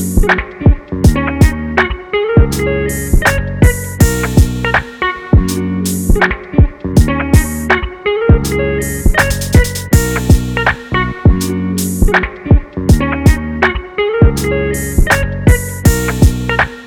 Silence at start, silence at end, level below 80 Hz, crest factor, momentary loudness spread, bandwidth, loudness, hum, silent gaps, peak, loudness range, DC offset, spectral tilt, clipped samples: 0 s; 0 s; -16 dBFS; 12 dB; 4 LU; 18.5 kHz; -13 LUFS; none; none; 0 dBFS; 0 LU; under 0.1%; -5.5 dB/octave; under 0.1%